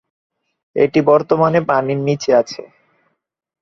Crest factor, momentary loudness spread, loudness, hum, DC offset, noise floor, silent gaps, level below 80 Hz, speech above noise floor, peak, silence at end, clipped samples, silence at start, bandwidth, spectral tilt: 16 dB; 13 LU; -15 LUFS; none; under 0.1%; -68 dBFS; none; -60 dBFS; 53 dB; -2 dBFS; 0.95 s; under 0.1%; 0.75 s; 7.2 kHz; -6.5 dB/octave